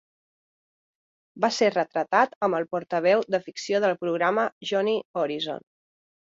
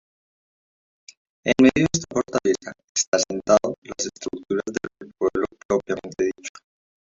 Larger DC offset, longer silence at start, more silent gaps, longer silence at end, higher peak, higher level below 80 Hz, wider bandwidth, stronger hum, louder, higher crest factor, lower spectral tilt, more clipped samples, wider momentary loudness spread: neither; about the same, 1.35 s vs 1.45 s; about the same, 2.36-2.41 s, 4.52-4.61 s, 5.05-5.14 s vs 2.84-2.95 s, 3.08-3.12 s, 3.78-3.82 s, 5.65-5.69 s; first, 0.75 s vs 0.5 s; about the same, -6 dBFS vs -4 dBFS; second, -74 dBFS vs -54 dBFS; about the same, 7.8 kHz vs 7.8 kHz; neither; about the same, -25 LUFS vs -23 LUFS; about the same, 20 dB vs 20 dB; about the same, -4.5 dB/octave vs -4 dB/octave; neither; second, 7 LU vs 13 LU